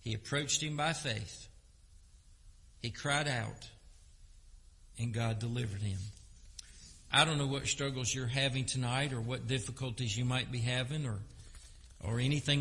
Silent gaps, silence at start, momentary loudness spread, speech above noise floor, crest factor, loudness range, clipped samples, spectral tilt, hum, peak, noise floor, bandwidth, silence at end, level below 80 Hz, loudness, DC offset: none; 0 s; 20 LU; 25 dB; 24 dB; 7 LU; under 0.1%; -4 dB/octave; none; -12 dBFS; -59 dBFS; 11.5 kHz; 0 s; -56 dBFS; -34 LUFS; under 0.1%